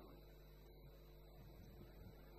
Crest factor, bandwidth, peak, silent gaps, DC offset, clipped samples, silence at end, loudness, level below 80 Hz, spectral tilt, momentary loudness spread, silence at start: 12 dB; 14.5 kHz; -48 dBFS; none; under 0.1%; under 0.1%; 0 s; -63 LUFS; -64 dBFS; -6.5 dB/octave; 3 LU; 0 s